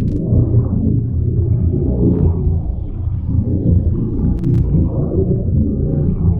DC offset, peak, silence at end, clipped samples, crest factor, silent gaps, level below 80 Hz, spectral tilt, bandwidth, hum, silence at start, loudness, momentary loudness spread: under 0.1%; -2 dBFS; 0 s; under 0.1%; 12 dB; none; -22 dBFS; -13.5 dB/octave; 1.6 kHz; none; 0 s; -17 LUFS; 4 LU